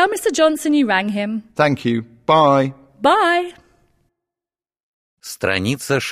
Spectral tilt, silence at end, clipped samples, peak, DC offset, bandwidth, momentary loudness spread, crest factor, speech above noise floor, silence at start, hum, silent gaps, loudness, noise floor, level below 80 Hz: -5 dB/octave; 0 s; under 0.1%; -2 dBFS; under 0.1%; 15.5 kHz; 10 LU; 16 dB; over 73 dB; 0 s; none; 4.83-5.17 s; -17 LUFS; under -90 dBFS; -58 dBFS